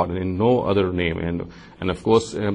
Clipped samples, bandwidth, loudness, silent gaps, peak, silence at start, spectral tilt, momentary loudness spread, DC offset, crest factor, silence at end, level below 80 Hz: under 0.1%; 10.5 kHz; -22 LUFS; none; -6 dBFS; 0 s; -6.5 dB/octave; 10 LU; under 0.1%; 16 dB; 0 s; -44 dBFS